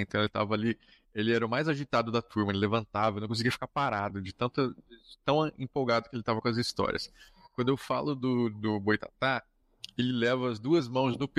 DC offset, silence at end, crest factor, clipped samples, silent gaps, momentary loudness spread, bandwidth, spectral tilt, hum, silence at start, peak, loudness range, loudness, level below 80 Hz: under 0.1%; 0.1 s; 20 dB; under 0.1%; none; 6 LU; 14.5 kHz; -6 dB/octave; none; 0 s; -12 dBFS; 2 LU; -30 LUFS; -62 dBFS